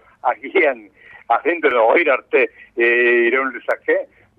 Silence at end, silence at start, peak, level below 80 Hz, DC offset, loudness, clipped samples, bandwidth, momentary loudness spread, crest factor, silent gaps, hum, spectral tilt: 0.35 s; 0.25 s; -4 dBFS; -66 dBFS; under 0.1%; -17 LUFS; under 0.1%; 4.7 kHz; 8 LU; 14 dB; none; none; -5.5 dB/octave